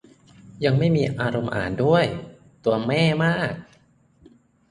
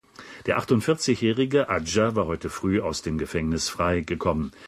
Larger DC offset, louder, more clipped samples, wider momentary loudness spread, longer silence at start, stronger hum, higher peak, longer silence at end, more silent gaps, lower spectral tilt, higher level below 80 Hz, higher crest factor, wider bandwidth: neither; first, -22 LUFS vs -25 LUFS; neither; about the same, 8 LU vs 6 LU; first, 0.45 s vs 0.2 s; neither; first, -4 dBFS vs -8 dBFS; first, 1.05 s vs 0 s; neither; first, -7 dB/octave vs -5 dB/octave; second, -52 dBFS vs -42 dBFS; about the same, 18 dB vs 16 dB; second, 10.5 kHz vs 15 kHz